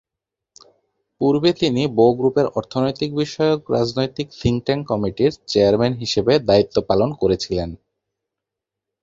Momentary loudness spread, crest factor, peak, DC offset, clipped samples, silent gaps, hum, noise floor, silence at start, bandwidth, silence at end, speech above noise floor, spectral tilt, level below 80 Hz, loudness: 7 LU; 18 dB; -2 dBFS; under 0.1%; under 0.1%; none; none; -85 dBFS; 1.2 s; 7.8 kHz; 1.3 s; 66 dB; -6.5 dB/octave; -46 dBFS; -19 LUFS